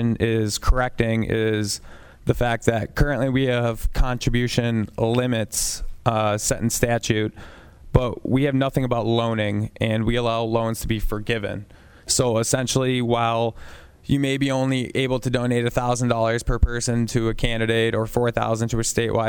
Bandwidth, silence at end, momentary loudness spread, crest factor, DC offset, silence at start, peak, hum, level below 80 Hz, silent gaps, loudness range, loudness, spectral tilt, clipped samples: 19.5 kHz; 0 s; 5 LU; 22 dB; under 0.1%; 0 s; 0 dBFS; none; -32 dBFS; none; 1 LU; -22 LUFS; -5 dB/octave; under 0.1%